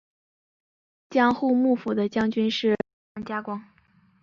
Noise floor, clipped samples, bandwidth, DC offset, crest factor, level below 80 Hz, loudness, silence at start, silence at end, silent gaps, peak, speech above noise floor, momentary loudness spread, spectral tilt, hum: -61 dBFS; under 0.1%; 7.2 kHz; under 0.1%; 20 dB; -62 dBFS; -24 LUFS; 1.1 s; 0.6 s; 2.93-3.15 s; -6 dBFS; 38 dB; 14 LU; -6 dB/octave; none